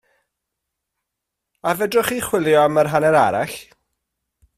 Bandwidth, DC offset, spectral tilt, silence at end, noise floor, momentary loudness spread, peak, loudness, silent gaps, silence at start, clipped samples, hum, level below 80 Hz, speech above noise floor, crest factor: 16 kHz; under 0.1%; -4.5 dB/octave; 0.95 s; -81 dBFS; 11 LU; -2 dBFS; -18 LUFS; none; 1.65 s; under 0.1%; none; -56 dBFS; 64 dB; 18 dB